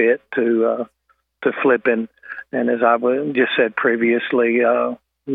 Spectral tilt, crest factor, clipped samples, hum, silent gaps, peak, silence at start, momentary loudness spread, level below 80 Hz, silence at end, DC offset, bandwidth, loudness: -8.5 dB/octave; 16 dB; under 0.1%; none; none; -2 dBFS; 0 s; 10 LU; -74 dBFS; 0 s; under 0.1%; 4 kHz; -18 LUFS